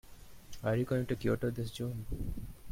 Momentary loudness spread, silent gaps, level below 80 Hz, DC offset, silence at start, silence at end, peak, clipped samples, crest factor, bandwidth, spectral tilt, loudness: 10 LU; none; -48 dBFS; under 0.1%; 0.05 s; 0 s; -20 dBFS; under 0.1%; 16 dB; 16.5 kHz; -7 dB/octave; -36 LUFS